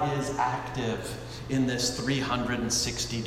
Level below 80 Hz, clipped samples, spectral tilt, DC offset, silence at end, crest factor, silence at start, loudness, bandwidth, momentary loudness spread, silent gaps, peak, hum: -48 dBFS; under 0.1%; -4 dB/octave; under 0.1%; 0 s; 16 dB; 0 s; -29 LUFS; 16 kHz; 6 LU; none; -14 dBFS; none